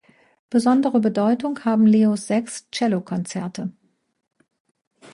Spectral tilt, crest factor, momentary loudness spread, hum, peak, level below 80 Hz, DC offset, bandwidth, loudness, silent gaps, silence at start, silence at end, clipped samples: -6 dB/octave; 14 dB; 13 LU; none; -8 dBFS; -68 dBFS; under 0.1%; 11.5 kHz; -20 LUFS; none; 0.5 s; 1.45 s; under 0.1%